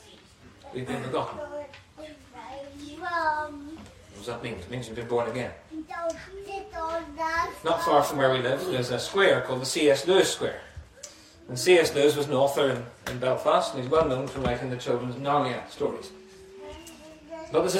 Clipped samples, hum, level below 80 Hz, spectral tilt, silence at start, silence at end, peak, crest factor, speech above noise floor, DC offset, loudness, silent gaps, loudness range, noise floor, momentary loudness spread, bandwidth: under 0.1%; none; -54 dBFS; -4.5 dB/octave; 0.05 s; 0 s; -6 dBFS; 20 dB; 27 dB; under 0.1%; -26 LUFS; none; 10 LU; -52 dBFS; 22 LU; 16 kHz